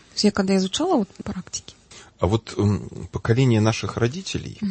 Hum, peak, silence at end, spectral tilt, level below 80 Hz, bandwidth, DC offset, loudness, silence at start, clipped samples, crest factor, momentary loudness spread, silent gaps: none; -4 dBFS; 0 s; -5.5 dB/octave; -46 dBFS; 8.8 kHz; under 0.1%; -23 LUFS; 0.15 s; under 0.1%; 18 dB; 12 LU; none